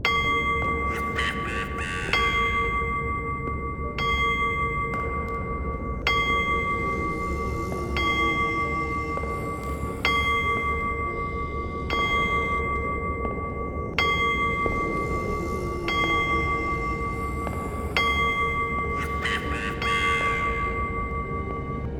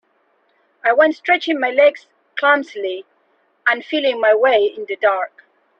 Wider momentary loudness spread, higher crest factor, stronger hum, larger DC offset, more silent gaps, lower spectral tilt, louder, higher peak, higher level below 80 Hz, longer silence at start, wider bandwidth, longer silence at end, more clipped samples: second, 8 LU vs 12 LU; about the same, 18 dB vs 16 dB; neither; neither; neither; first, -5 dB/octave vs -3.5 dB/octave; second, -25 LUFS vs -17 LUFS; second, -6 dBFS vs -2 dBFS; first, -36 dBFS vs -68 dBFS; second, 0 s vs 0.85 s; first, 17.5 kHz vs 6.8 kHz; second, 0 s vs 0.5 s; neither